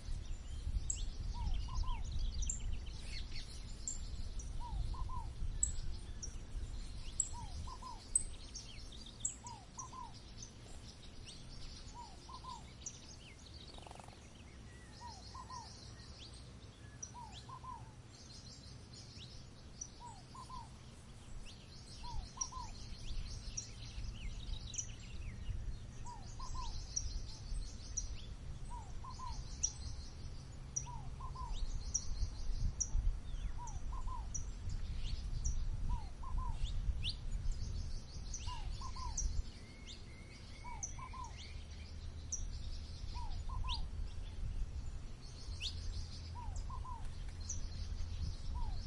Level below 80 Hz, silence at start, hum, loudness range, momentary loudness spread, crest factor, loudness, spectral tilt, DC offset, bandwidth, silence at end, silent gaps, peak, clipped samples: -44 dBFS; 0 s; none; 9 LU; 12 LU; 24 dB; -46 LUFS; -3 dB/octave; under 0.1%; 11.5 kHz; 0 s; none; -18 dBFS; under 0.1%